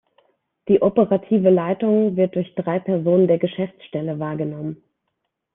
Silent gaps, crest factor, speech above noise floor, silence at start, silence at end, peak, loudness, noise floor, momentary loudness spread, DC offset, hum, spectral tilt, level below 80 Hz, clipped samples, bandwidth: none; 16 dB; 58 dB; 0.65 s; 0.8 s; -4 dBFS; -20 LUFS; -77 dBFS; 11 LU; under 0.1%; none; -11.5 dB/octave; -60 dBFS; under 0.1%; 3.8 kHz